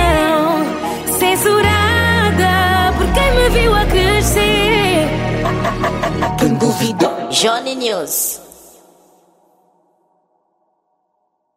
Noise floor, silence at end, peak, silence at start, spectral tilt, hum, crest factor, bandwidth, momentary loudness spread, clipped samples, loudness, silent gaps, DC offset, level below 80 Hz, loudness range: -67 dBFS; 3.1 s; 0 dBFS; 0 s; -4 dB/octave; none; 14 dB; 16.5 kHz; 6 LU; under 0.1%; -14 LUFS; none; under 0.1%; -26 dBFS; 8 LU